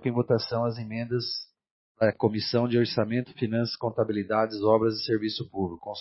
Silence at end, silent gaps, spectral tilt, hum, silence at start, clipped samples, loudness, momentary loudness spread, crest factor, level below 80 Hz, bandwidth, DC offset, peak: 0 s; 1.71-1.95 s; -9 dB/octave; none; 0 s; under 0.1%; -27 LUFS; 9 LU; 18 dB; -66 dBFS; 6 kHz; under 0.1%; -8 dBFS